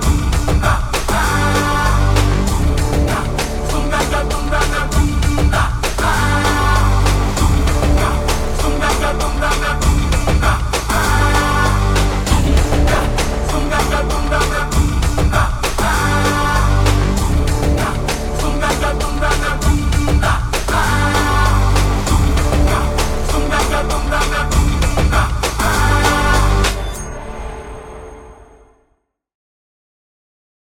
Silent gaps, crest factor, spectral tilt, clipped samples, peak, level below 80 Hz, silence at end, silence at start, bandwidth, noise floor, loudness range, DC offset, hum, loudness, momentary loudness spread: none; 14 dB; -4.5 dB/octave; under 0.1%; 0 dBFS; -18 dBFS; 2.45 s; 0 s; 17 kHz; -64 dBFS; 2 LU; under 0.1%; none; -16 LUFS; 4 LU